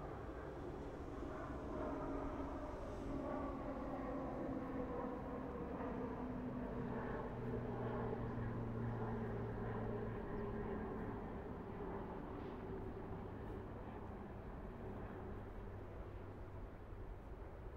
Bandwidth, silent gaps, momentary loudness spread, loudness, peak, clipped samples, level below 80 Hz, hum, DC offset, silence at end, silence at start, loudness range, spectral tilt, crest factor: 9.2 kHz; none; 8 LU; -47 LUFS; -30 dBFS; under 0.1%; -54 dBFS; none; under 0.1%; 0 s; 0 s; 6 LU; -9 dB/octave; 16 dB